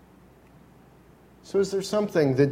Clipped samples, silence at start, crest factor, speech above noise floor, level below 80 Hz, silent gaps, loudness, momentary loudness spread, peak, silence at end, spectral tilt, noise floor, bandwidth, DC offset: under 0.1%; 1.45 s; 18 dB; 31 dB; -60 dBFS; none; -25 LUFS; 5 LU; -8 dBFS; 0 s; -6.5 dB/octave; -54 dBFS; 15.5 kHz; under 0.1%